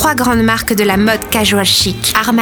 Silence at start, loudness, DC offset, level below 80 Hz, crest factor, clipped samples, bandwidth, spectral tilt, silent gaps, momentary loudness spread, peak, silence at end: 0 s; -11 LUFS; under 0.1%; -34 dBFS; 12 dB; under 0.1%; over 20 kHz; -3.5 dB/octave; none; 3 LU; 0 dBFS; 0 s